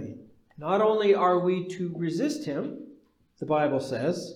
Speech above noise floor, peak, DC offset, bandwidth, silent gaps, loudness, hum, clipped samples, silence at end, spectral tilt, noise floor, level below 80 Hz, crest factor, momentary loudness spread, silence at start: 31 dB; -10 dBFS; under 0.1%; 13 kHz; none; -26 LUFS; none; under 0.1%; 0 s; -6.5 dB/octave; -57 dBFS; -72 dBFS; 16 dB; 15 LU; 0 s